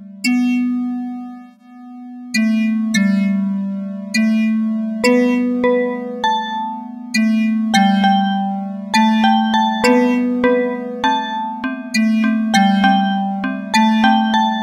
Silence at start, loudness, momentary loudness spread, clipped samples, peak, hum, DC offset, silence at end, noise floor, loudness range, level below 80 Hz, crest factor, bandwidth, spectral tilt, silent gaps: 0 s; -16 LUFS; 10 LU; under 0.1%; 0 dBFS; none; under 0.1%; 0 s; -38 dBFS; 4 LU; -58 dBFS; 16 dB; 14 kHz; -5 dB/octave; none